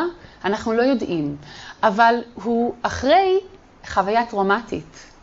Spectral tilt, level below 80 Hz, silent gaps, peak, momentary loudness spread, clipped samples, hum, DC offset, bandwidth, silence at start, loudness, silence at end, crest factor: -5.5 dB/octave; -48 dBFS; none; -2 dBFS; 12 LU; under 0.1%; none; under 0.1%; 8 kHz; 0 s; -20 LUFS; 0.15 s; 18 dB